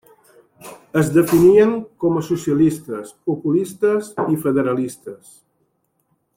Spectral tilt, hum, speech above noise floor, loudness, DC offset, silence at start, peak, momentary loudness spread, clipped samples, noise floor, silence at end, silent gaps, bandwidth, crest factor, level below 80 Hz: -7 dB/octave; none; 50 dB; -18 LUFS; under 0.1%; 0.65 s; -2 dBFS; 15 LU; under 0.1%; -67 dBFS; 1.2 s; none; 16.5 kHz; 16 dB; -56 dBFS